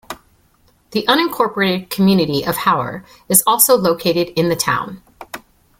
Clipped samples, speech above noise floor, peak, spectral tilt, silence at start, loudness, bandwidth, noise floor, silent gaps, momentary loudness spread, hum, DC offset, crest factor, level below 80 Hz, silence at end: under 0.1%; 40 dB; 0 dBFS; -3.5 dB/octave; 0.1 s; -15 LUFS; 17 kHz; -56 dBFS; none; 22 LU; none; under 0.1%; 18 dB; -52 dBFS; 0.4 s